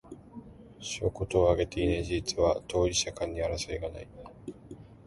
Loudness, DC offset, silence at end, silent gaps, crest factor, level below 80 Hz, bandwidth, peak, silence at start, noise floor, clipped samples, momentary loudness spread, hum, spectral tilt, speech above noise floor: -30 LUFS; under 0.1%; 0.15 s; none; 20 dB; -44 dBFS; 11.5 kHz; -10 dBFS; 0.05 s; -49 dBFS; under 0.1%; 21 LU; none; -4.5 dB/octave; 20 dB